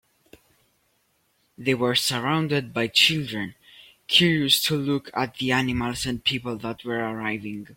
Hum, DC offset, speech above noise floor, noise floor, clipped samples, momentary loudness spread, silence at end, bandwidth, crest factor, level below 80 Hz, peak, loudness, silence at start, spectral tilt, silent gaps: none; under 0.1%; 44 dB; -68 dBFS; under 0.1%; 13 LU; 0 s; 16.5 kHz; 20 dB; -54 dBFS; -4 dBFS; -23 LUFS; 1.6 s; -4 dB/octave; none